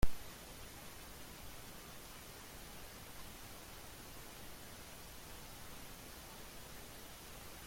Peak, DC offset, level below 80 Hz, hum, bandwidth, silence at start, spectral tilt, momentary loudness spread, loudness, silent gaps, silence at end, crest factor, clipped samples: -18 dBFS; under 0.1%; -52 dBFS; none; 16.5 kHz; 0 s; -3.5 dB/octave; 0 LU; -52 LUFS; none; 0 s; 24 dB; under 0.1%